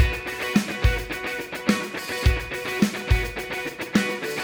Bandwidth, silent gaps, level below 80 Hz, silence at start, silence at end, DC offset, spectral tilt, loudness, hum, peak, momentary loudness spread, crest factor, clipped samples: over 20 kHz; none; -30 dBFS; 0 s; 0 s; under 0.1%; -5 dB/octave; -25 LUFS; none; -6 dBFS; 6 LU; 20 dB; under 0.1%